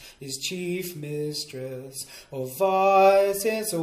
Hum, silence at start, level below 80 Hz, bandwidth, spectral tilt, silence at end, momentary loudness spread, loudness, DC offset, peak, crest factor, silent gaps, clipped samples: none; 0 s; -64 dBFS; 15.5 kHz; -4 dB/octave; 0 s; 18 LU; -24 LUFS; under 0.1%; -8 dBFS; 16 dB; none; under 0.1%